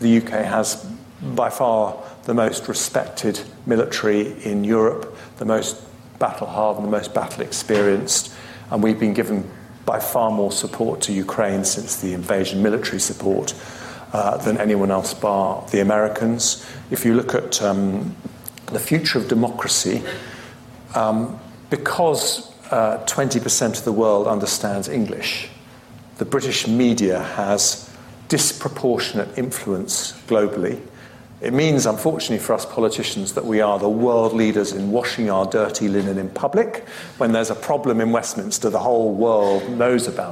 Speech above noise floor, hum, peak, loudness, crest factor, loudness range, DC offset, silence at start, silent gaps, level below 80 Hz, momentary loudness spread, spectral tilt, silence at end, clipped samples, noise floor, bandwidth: 23 dB; none; -6 dBFS; -20 LUFS; 16 dB; 2 LU; under 0.1%; 0 s; none; -56 dBFS; 10 LU; -4 dB/octave; 0 s; under 0.1%; -43 dBFS; 16 kHz